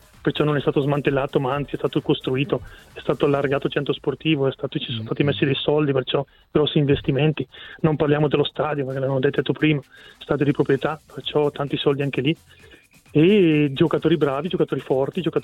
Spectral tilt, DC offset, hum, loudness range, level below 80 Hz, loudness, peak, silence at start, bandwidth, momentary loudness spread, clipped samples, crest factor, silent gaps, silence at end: -8 dB/octave; under 0.1%; none; 3 LU; -50 dBFS; -22 LUFS; -4 dBFS; 0.25 s; 9.6 kHz; 8 LU; under 0.1%; 16 dB; none; 0 s